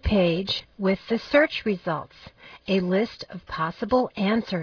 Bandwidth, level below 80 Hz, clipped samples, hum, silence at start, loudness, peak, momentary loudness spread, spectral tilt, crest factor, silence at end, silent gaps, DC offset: 5.4 kHz; -44 dBFS; under 0.1%; none; 0 s; -25 LUFS; -6 dBFS; 13 LU; -7 dB/octave; 18 dB; 0 s; none; under 0.1%